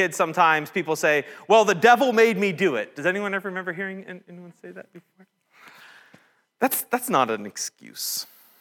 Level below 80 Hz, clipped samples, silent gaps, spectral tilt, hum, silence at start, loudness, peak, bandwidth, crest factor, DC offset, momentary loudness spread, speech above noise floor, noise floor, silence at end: -82 dBFS; under 0.1%; none; -3.5 dB/octave; none; 0 s; -22 LUFS; -4 dBFS; 19.5 kHz; 20 dB; under 0.1%; 23 LU; 35 dB; -58 dBFS; 0.35 s